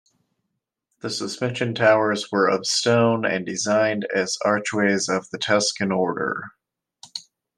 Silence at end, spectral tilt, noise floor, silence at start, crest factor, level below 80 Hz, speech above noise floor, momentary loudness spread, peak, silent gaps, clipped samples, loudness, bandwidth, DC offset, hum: 0.35 s; -4 dB/octave; -79 dBFS; 1.05 s; 20 dB; -70 dBFS; 58 dB; 14 LU; -4 dBFS; none; under 0.1%; -21 LUFS; 12.5 kHz; under 0.1%; none